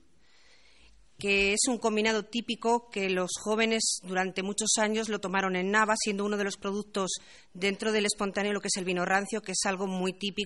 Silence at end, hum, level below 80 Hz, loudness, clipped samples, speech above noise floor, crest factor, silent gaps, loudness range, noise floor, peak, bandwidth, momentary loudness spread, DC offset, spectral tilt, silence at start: 0 s; none; -62 dBFS; -29 LUFS; under 0.1%; 35 dB; 20 dB; none; 2 LU; -64 dBFS; -10 dBFS; 11.5 kHz; 7 LU; 0.1%; -3 dB/octave; 1.2 s